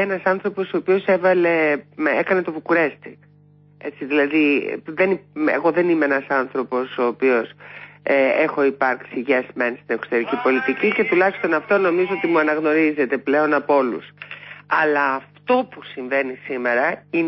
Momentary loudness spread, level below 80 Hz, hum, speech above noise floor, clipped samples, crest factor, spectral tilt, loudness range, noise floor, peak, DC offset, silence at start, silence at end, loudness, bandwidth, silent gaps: 9 LU; -70 dBFS; 50 Hz at -50 dBFS; 32 dB; under 0.1%; 14 dB; -10.5 dB/octave; 3 LU; -51 dBFS; -6 dBFS; under 0.1%; 0 s; 0 s; -20 LUFS; 5.8 kHz; none